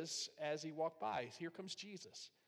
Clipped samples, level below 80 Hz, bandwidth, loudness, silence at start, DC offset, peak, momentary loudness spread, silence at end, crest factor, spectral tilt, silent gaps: under 0.1%; -88 dBFS; 15 kHz; -46 LUFS; 0 s; under 0.1%; -30 dBFS; 9 LU; 0.2 s; 16 dB; -3 dB/octave; none